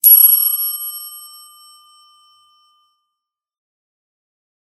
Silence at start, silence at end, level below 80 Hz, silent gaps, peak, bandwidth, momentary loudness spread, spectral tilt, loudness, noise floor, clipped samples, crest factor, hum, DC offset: 0.05 s; 3.45 s; under -90 dBFS; none; 0 dBFS; 16.5 kHz; 26 LU; 7 dB/octave; -10 LUFS; -81 dBFS; under 0.1%; 18 dB; none; under 0.1%